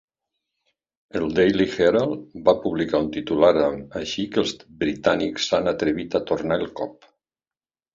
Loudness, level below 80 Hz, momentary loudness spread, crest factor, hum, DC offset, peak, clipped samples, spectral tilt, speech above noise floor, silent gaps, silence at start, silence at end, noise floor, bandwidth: -22 LUFS; -52 dBFS; 9 LU; 20 dB; none; under 0.1%; -4 dBFS; under 0.1%; -5.5 dB/octave; over 68 dB; none; 1.15 s; 1.05 s; under -90 dBFS; 7.6 kHz